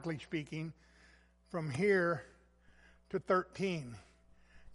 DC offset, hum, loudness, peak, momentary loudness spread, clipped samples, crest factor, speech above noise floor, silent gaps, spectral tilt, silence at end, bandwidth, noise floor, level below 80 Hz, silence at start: under 0.1%; none; -36 LUFS; -18 dBFS; 14 LU; under 0.1%; 20 dB; 29 dB; none; -6.5 dB/octave; 0 s; 11.5 kHz; -65 dBFS; -66 dBFS; 0 s